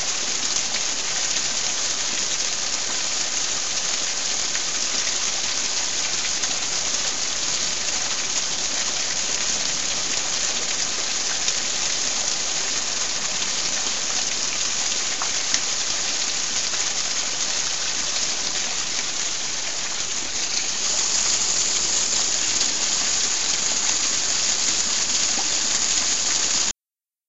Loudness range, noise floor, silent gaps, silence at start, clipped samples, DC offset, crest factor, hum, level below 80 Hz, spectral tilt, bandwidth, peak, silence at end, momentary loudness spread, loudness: 3 LU; under -90 dBFS; none; 0 s; under 0.1%; 3%; 24 dB; none; -54 dBFS; 1.5 dB/octave; 8.4 kHz; 0 dBFS; 0 s; 4 LU; -21 LUFS